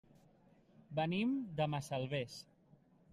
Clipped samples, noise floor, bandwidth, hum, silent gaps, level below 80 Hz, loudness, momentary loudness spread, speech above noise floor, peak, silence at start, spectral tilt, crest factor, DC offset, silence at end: under 0.1%; -68 dBFS; 13.5 kHz; none; none; -72 dBFS; -39 LUFS; 13 LU; 30 dB; -24 dBFS; 0.9 s; -6.5 dB/octave; 18 dB; under 0.1%; 0.7 s